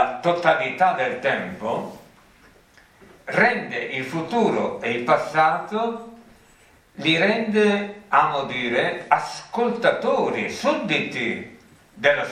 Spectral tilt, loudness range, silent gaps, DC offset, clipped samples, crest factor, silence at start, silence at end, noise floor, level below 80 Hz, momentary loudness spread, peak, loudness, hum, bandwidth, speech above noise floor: -5 dB/octave; 3 LU; none; under 0.1%; under 0.1%; 22 dB; 0 s; 0 s; -54 dBFS; -64 dBFS; 8 LU; 0 dBFS; -22 LUFS; none; 14 kHz; 32 dB